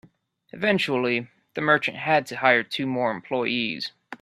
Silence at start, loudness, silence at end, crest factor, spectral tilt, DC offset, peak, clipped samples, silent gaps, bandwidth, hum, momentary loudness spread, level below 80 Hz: 0.55 s; -24 LUFS; 0.05 s; 22 dB; -5.5 dB/octave; under 0.1%; -2 dBFS; under 0.1%; none; 13.5 kHz; none; 8 LU; -68 dBFS